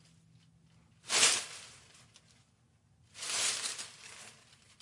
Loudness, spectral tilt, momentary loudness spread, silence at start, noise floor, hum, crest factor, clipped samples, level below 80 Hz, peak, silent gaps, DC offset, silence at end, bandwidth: -30 LUFS; 1.5 dB/octave; 26 LU; 1.05 s; -69 dBFS; none; 26 dB; under 0.1%; -80 dBFS; -12 dBFS; none; under 0.1%; 0.5 s; 11.5 kHz